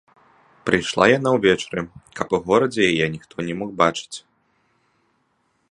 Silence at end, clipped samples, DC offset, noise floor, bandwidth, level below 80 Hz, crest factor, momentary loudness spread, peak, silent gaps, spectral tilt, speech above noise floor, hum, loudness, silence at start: 1.5 s; under 0.1%; under 0.1%; -67 dBFS; 11 kHz; -54 dBFS; 22 dB; 14 LU; 0 dBFS; none; -5 dB/octave; 47 dB; none; -20 LUFS; 0.65 s